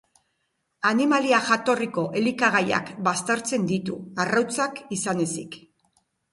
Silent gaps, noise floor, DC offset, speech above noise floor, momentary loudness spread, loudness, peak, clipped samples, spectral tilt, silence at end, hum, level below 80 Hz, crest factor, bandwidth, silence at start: none; -75 dBFS; under 0.1%; 51 dB; 8 LU; -24 LUFS; -6 dBFS; under 0.1%; -4 dB/octave; 0.75 s; none; -66 dBFS; 20 dB; 11.5 kHz; 0.8 s